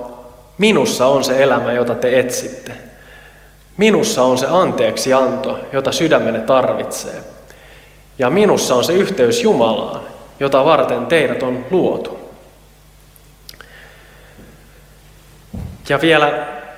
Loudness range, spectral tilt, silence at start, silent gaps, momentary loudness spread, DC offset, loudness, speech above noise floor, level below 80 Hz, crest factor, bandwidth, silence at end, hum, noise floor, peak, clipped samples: 6 LU; -4.5 dB/octave; 0 s; none; 17 LU; under 0.1%; -15 LUFS; 31 dB; -46 dBFS; 16 dB; 16.5 kHz; 0 s; none; -45 dBFS; 0 dBFS; under 0.1%